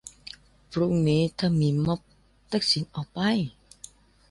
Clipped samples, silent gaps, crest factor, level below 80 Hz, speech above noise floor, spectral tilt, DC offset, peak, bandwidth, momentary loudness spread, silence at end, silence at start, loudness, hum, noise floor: under 0.1%; none; 16 dB; -54 dBFS; 26 dB; -6 dB/octave; under 0.1%; -12 dBFS; 11.5 kHz; 23 LU; 0.8 s; 0.05 s; -26 LUFS; 50 Hz at -45 dBFS; -51 dBFS